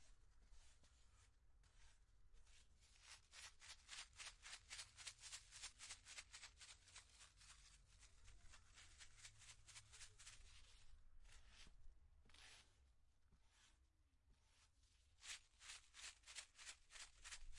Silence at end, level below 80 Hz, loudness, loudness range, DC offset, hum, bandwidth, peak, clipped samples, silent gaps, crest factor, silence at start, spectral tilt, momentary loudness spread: 0 s; -72 dBFS; -60 LUFS; 8 LU; under 0.1%; none; 12 kHz; -36 dBFS; under 0.1%; none; 26 dB; 0 s; 0.5 dB/octave; 12 LU